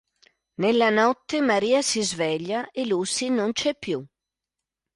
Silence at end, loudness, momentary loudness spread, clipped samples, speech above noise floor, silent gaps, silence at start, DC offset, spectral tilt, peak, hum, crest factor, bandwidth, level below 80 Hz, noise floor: 0.9 s; -23 LUFS; 10 LU; under 0.1%; 64 dB; none; 0.6 s; under 0.1%; -3.5 dB/octave; -8 dBFS; none; 16 dB; 11.5 kHz; -66 dBFS; -87 dBFS